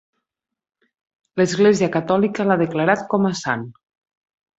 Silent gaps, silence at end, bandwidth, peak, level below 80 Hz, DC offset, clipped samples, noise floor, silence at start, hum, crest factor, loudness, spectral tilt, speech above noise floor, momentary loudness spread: none; 0.85 s; 8 kHz; -2 dBFS; -62 dBFS; under 0.1%; under 0.1%; -85 dBFS; 1.35 s; none; 20 dB; -19 LUFS; -6 dB/octave; 67 dB; 10 LU